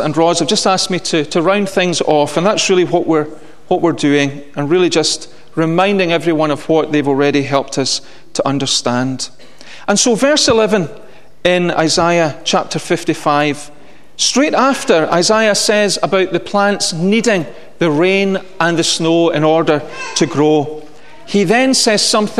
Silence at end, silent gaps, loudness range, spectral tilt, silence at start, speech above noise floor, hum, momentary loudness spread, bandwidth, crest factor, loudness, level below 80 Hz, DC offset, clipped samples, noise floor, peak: 0 s; none; 2 LU; -3.5 dB/octave; 0 s; 24 dB; none; 7 LU; 13.5 kHz; 14 dB; -13 LUFS; -52 dBFS; 2%; under 0.1%; -38 dBFS; 0 dBFS